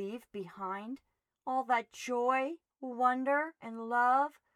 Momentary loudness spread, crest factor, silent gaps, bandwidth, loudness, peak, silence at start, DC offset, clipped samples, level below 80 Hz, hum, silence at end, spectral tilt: 16 LU; 18 dB; none; 14 kHz; -33 LUFS; -16 dBFS; 0 s; under 0.1%; under 0.1%; -86 dBFS; none; 0.25 s; -4.5 dB/octave